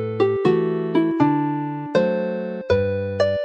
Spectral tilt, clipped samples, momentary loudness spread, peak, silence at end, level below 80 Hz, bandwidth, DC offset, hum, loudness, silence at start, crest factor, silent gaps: -8 dB/octave; under 0.1%; 6 LU; -6 dBFS; 0 s; -52 dBFS; 8.2 kHz; under 0.1%; none; -21 LUFS; 0 s; 16 dB; none